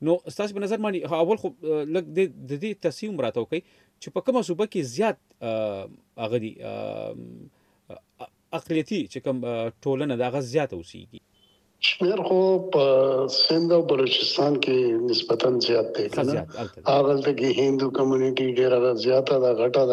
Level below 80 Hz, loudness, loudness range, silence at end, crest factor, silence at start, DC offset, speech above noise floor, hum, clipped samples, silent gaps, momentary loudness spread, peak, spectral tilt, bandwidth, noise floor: -68 dBFS; -24 LUFS; 10 LU; 0 s; 18 dB; 0 s; under 0.1%; 39 dB; none; under 0.1%; none; 13 LU; -6 dBFS; -5.5 dB/octave; 11.5 kHz; -62 dBFS